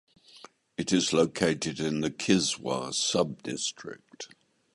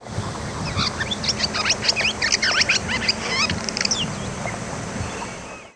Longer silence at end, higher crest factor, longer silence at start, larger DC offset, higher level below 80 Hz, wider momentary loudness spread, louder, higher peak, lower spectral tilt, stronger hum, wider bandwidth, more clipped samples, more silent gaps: first, 0.5 s vs 0.05 s; about the same, 20 dB vs 20 dB; first, 0.35 s vs 0 s; neither; second, -62 dBFS vs -42 dBFS; first, 19 LU vs 12 LU; second, -28 LUFS vs -21 LUFS; second, -10 dBFS vs -4 dBFS; first, -3.5 dB/octave vs -2 dB/octave; neither; about the same, 11.5 kHz vs 11 kHz; neither; neither